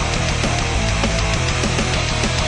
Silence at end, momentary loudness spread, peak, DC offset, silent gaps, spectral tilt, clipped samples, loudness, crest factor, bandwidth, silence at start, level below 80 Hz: 0 s; 1 LU; -4 dBFS; under 0.1%; none; -4 dB/octave; under 0.1%; -19 LUFS; 14 dB; 11.5 kHz; 0 s; -26 dBFS